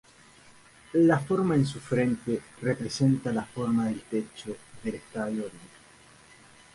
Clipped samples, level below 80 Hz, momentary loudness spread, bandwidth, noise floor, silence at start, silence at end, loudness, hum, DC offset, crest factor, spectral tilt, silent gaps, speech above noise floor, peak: under 0.1%; -60 dBFS; 14 LU; 11.5 kHz; -55 dBFS; 0.95 s; 1.1 s; -28 LUFS; none; under 0.1%; 18 dB; -7 dB/octave; none; 28 dB; -10 dBFS